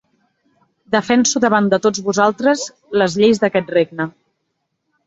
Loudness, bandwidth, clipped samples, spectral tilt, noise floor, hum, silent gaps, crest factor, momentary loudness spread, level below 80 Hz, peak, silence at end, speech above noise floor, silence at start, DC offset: -16 LUFS; 8 kHz; under 0.1%; -4 dB/octave; -72 dBFS; none; none; 16 dB; 8 LU; -58 dBFS; -2 dBFS; 0.95 s; 57 dB; 0.9 s; under 0.1%